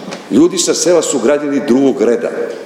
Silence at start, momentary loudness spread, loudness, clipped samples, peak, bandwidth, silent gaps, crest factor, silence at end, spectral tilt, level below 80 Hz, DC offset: 0 s; 5 LU; -12 LUFS; under 0.1%; 0 dBFS; 15 kHz; none; 12 dB; 0 s; -3.5 dB/octave; -56 dBFS; under 0.1%